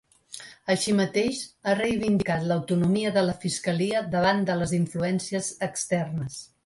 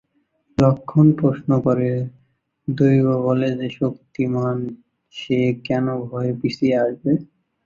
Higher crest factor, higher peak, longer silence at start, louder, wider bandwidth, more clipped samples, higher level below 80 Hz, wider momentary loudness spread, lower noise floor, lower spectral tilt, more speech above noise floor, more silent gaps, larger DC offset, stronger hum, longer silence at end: about the same, 16 dB vs 18 dB; second, -10 dBFS vs -2 dBFS; second, 0.3 s vs 0.6 s; second, -26 LUFS vs -20 LUFS; first, 11.5 kHz vs 7.4 kHz; neither; about the same, -56 dBFS vs -54 dBFS; second, 8 LU vs 12 LU; second, -45 dBFS vs -65 dBFS; second, -5 dB/octave vs -9 dB/octave; second, 20 dB vs 46 dB; neither; neither; neither; second, 0.2 s vs 0.4 s